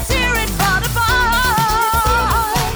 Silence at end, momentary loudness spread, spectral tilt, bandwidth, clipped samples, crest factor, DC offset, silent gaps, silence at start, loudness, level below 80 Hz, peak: 0 s; 2 LU; -3 dB/octave; over 20 kHz; under 0.1%; 12 dB; under 0.1%; none; 0 s; -15 LUFS; -24 dBFS; -4 dBFS